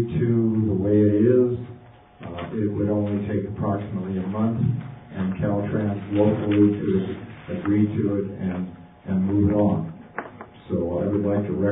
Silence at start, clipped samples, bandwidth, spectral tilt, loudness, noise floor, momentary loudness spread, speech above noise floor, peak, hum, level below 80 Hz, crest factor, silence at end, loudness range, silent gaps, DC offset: 0 s; under 0.1%; 3.9 kHz; -13.5 dB/octave; -23 LUFS; -46 dBFS; 16 LU; 25 dB; -6 dBFS; none; -44 dBFS; 16 dB; 0 s; 3 LU; none; under 0.1%